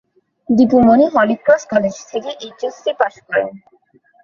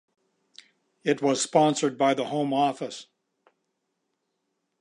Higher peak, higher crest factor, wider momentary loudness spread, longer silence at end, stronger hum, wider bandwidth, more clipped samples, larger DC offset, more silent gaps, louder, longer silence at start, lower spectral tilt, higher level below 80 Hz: first, 0 dBFS vs -6 dBFS; second, 16 dB vs 22 dB; about the same, 15 LU vs 13 LU; second, 0.65 s vs 1.75 s; neither; second, 7.2 kHz vs 11.5 kHz; neither; neither; neither; first, -15 LUFS vs -25 LUFS; second, 0.5 s vs 1.05 s; first, -6 dB/octave vs -4.5 dB/octave; first, -50 dBFS vs -82 dBFS